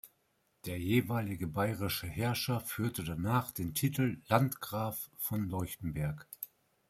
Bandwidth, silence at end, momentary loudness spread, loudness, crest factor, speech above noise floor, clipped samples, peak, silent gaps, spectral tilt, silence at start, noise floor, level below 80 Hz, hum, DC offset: 16 kHz; 0.45 s; 9 LU; -35 LUFS; 26 dB; 42 dB; under 0.1%; -10 dBFS; none; -5.5 dB/octave; 0.05 s; -76 dBFS; -60 dBFS; none; under 0.1%